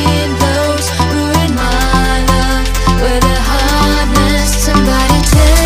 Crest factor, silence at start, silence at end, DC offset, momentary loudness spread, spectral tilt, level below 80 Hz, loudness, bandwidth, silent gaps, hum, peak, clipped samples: 10 dB; 0 s; 0 s; under 0.1%; 3 LU; -4.5 dB/octave; -14 dBFS; -12 LUFS; 16 kHz; none; none; 0 dBFS; under 0.1%